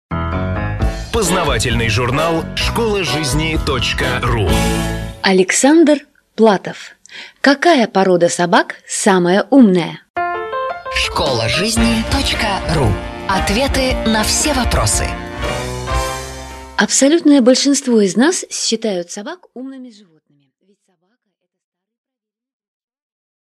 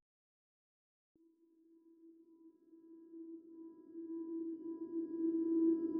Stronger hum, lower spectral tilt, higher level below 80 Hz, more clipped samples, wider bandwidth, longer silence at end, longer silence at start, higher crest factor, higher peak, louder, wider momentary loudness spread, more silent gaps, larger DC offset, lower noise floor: neither; second, -4 dB/octave vs -10.5 dB/octave; first, -28 dBFS vs under -90 dBFS; neither; first, 13.5 kHz vs 1.7 kHz; first, 3.65 s vs 0 s; second, 0.1 s vs 2.05 s; about the same, 16 dB vs 18 dB; first, 0 dBFS vs -26 dBFS; first, -15 LUFS vs -39 LUFS; second, 12 LU vs 22 LU; first, 10.10-10.14 s vs none; neither; about the same, -74 dBFS vs -71 dBFS